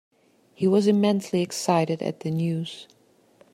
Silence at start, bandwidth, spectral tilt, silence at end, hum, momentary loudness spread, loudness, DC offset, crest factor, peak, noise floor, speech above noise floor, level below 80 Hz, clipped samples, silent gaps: 0.6 s; 14.5 kHz; -6 dB/octave; 0.7 s; none; 10 LU; -24 LUFS; under 0.1%; 18 dB; -6 dBFS; -58 dBFS; 35 dB; -70 dBFS; under 0.1%; none